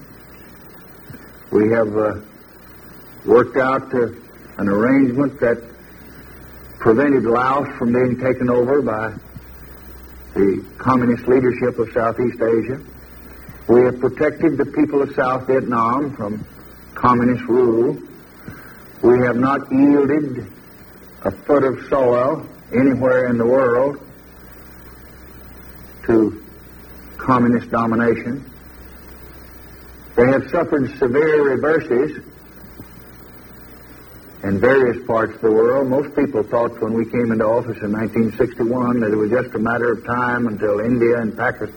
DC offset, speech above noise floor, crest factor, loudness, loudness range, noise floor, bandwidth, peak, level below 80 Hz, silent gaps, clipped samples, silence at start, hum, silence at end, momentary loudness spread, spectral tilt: under 0.1%; 25 dB; 18 dB; -18 LUFS; 4 LU; -42 dBFS; 16.5 kHz; 0 dBFS; -46 dBFS; none; under 0.1%; 0 s; none; 0 s; 23 LU; -8.5 dB/octave